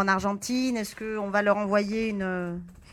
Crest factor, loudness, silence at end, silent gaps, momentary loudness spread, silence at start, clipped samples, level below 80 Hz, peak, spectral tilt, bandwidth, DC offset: 18 dB; -27 LUFS; 0 s; none; 8 LU; 0 s; under 0.1%; -56 dBFS; -8 dBFS; -5 dB/octave; 17 kHz; under 0.1%